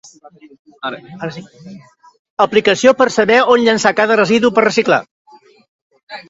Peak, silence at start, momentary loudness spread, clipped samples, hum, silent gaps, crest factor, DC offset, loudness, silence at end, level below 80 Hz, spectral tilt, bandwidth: 0 dBFS; 0.85 s; 16 LU; under 0.1%; none; 2.19-2.37 s, 5.11-5.25 s, 5.68-5.90 s, 6.03-6.07 s; 16 dB; under 0.1%; -12 LUFS; 0.1 s; -56 dBFS; -4 dB/octave; 8 kHz